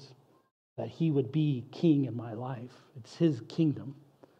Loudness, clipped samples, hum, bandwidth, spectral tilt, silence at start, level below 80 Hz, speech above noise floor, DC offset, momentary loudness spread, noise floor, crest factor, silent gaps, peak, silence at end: -31 LUFS; under 0.1%; none; 8.2 kHz; -9 dB/octave; 0 s; -80 dBFS; 26 dB; under 0.1%; 20 LU; -57 dBFS; 18 dB; 0.51-0.76 s; -14 dBFS; 0.45 s